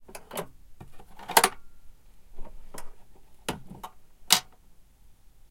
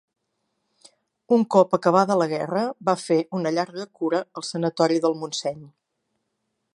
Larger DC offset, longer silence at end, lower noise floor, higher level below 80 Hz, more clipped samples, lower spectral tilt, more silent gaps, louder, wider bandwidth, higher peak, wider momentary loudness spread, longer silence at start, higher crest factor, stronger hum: neither; second, 0.05 s vs 1.1 s; second, -53 dBFS vs -77 dBFS; first, -50 dBFS vs -72 dBFS; neither; second, -0.5 dB/octave vs -5.5 dB/octave; neither; second, -26 LUFS vs -23 LUFS; first, 16.5 kHz vs 11.5 kHz; about the same, 0 dBFS vs -2 dBFS; first, 24 LU vs 10 LU; second, 0 s vs 1.3 s; first, 32 dB vs 22 dB; neither